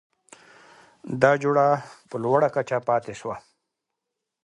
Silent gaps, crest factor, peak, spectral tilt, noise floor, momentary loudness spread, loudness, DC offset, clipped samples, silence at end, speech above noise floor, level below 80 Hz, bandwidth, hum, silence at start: none; 24 dB; -2 dBFS; -6.5 dB/octave; -83 dBFS; 15 LU; -23 LUFS; under 0.1%; under 0.1%; 1.05 s; 61 dB; -68 dBFS; 11 kHz; none; 1.05 s